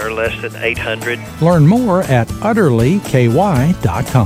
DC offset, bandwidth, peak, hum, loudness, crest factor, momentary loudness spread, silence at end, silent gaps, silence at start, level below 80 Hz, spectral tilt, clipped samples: under 0.1%; 16 kHz; 0 dBFS; none; -14 LUFS; 14 dB; 8 LU; 0 s; none; 0 s; -34 dBFS; -7 dB/octave; under 0.1%